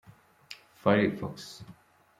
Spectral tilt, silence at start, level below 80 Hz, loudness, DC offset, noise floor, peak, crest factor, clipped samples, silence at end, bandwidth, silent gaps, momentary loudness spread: -6.5 dB/octave; 0.5 s; -68 dBFS; -28 LUFS; under 0.1%; -52 dBFS; -10 dBFS; 22 dB; under 0.1%; 0.45 s; 14.5 kHz; none; 23 LU